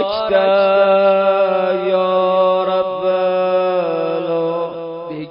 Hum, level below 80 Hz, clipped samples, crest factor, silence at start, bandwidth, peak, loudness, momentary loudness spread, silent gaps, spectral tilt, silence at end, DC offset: none; -60 dBFS; under 0.1%; 12 dB; 0 s; 5.4 kHz; -4 dBFS; -15 LUFS; 8 LU; none; -10.5 dB/octave; 0 s; under 0.1%